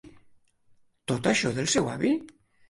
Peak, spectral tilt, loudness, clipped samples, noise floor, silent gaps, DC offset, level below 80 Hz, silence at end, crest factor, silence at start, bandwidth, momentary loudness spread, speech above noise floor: -10 dBFS; -4 dB/octave; -26 LUFS; under 0.1%; -61 dBFS; none; under 0.1%; -60 dBFS; 0.4 s; 18 dB; 0.05 s; 11.5 kHz; 7 LU; 35 dB